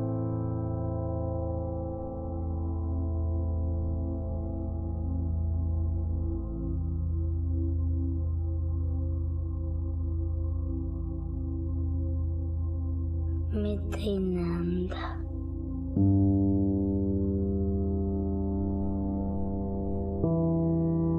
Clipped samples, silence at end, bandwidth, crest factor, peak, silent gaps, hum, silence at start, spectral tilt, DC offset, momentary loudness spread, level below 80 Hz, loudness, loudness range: under 0.1%; 0 s; 4.3 kHz; 16 dB; -14 dBFS; none; none; 0 s; -10.5 dB/octave; under 0.1%; 7 LU; -36 dBFS; -31 LUFS; 4 LU